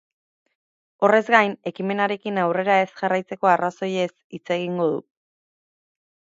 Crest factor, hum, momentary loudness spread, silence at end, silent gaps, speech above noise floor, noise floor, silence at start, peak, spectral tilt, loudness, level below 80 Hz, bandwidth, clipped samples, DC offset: 22 dB; none; 9 LU; 1.3 s; 4.24-4.30 s; over 69 dB; under -90 dBFS; 1 s; 0 dBFS; -6 dB/octave; -22 LUFS; -76 dBFS; 7.8 kHz; under 0.1%; under 0.1%